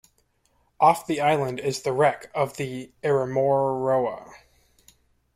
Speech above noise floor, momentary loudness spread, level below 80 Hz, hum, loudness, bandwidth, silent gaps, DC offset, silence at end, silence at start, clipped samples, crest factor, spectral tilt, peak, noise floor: 44 dB; 10 LU; -62 dBFS; none; -24 LUFS; 15.5 kHz; none; under 0.1%; 1 s; 0.8 s; under 0.1%; 20 dB; -5.5 dB/octave; -4 dBFS; -67 dBFS